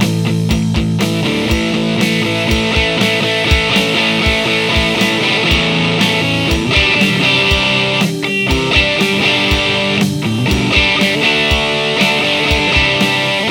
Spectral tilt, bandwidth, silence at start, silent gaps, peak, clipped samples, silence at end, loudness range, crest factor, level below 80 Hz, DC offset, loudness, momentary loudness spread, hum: -4.5 dB/octave; over 20 kHz; 0 s; none; 0 dBFS; under 0.1%; 0 s; 2 LU; 14 dB; -26 dBFS; under 0.1%; -12 LUFS; 4 LU; none